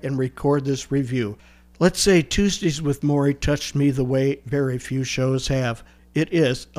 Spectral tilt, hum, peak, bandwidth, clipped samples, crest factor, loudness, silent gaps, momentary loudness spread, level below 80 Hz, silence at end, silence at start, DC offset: -5.5 dB/octave; none; -4 dBFS; 15.5 kHz; under 0.1%; 18 dB; -22 LUFS; none; 8 LU; -40 dBFS; 0.15 s; 0.05 s; under 0.1%